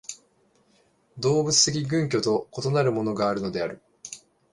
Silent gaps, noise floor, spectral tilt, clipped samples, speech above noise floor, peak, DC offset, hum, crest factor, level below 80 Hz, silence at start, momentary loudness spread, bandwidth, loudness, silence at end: none; -64 dBFS; -4 dB/octave; under 0.1%; 40 dB; -6 dBFS; under 0.1%; none; 20 dB; -60 dBFS; 0.1 s; 21 LU; 11.5 kHz; -24 LUFS; 0.35 s